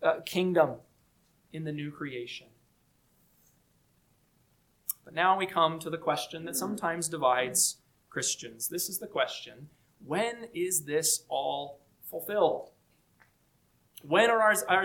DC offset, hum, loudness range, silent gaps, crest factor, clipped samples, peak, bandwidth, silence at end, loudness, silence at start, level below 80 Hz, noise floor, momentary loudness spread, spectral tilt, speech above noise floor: under 0.1%; none; 14 LU; none; 22 dB; under 0.1%; -10 dBFS; 19 kHz; 0 s; -29 LUFS; 0 s; -74 dBFS; -69 dBFS; 16 LU; -2.5 dB/octave; 39 dB